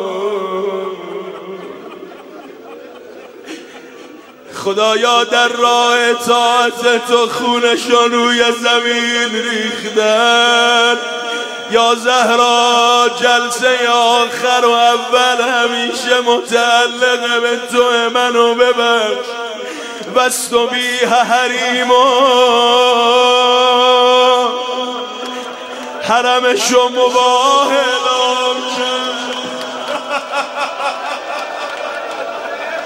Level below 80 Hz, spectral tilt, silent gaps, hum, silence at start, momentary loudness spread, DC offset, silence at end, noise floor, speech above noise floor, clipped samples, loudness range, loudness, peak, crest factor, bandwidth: -62 dBFS; -1 dB/octave; none; none; 0 s; 13 LU; under 0.1%; 0 s; -36 dBFS; 24 dB; under 0.1%; 9 LU; -12 LUFS; 0 dBFS; 14 dB; 16 kHz